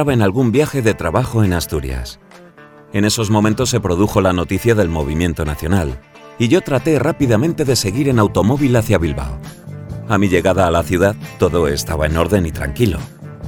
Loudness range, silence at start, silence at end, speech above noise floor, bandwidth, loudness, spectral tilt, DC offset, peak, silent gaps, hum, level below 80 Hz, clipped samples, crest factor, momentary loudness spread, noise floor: 2 LU; 0 s; 0 s; 26 dB; 18.5 kHz; -16 LUFS; -6 dB/octave; under 0.1%; 0 dBFS; none; none; -32 dBFS; under 0.1%; 16 dB; 11 LU; -41 dBFS